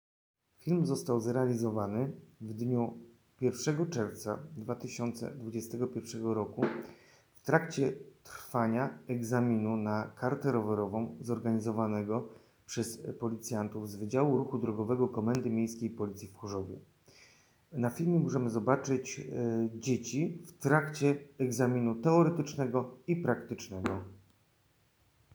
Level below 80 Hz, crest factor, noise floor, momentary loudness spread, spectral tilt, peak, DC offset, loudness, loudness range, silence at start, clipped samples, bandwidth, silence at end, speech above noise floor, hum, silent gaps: -74 dBFS; 24 dB; -70 dBFS; 11 LU; -6.5 dB/octave; -10 dBFS; under 0.1%; -33 LUFS; 5 LU; 0.65 s; under 0.1%; over 20 kHz; 1.2 s; 38 dB; none; none